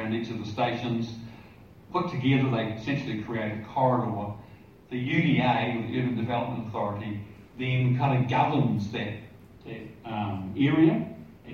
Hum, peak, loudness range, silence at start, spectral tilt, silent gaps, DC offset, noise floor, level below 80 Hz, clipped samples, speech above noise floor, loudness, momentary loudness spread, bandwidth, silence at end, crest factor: none; -10 dBFS; 2 LU; 0 s; -8 dB/octave; none; under 0.1%; -50 dBFS; -60 dBFS; under 0.1%; 23 dB; -28 LUFS; 16 LU; 6.8 kHz; 0 s; 18 dB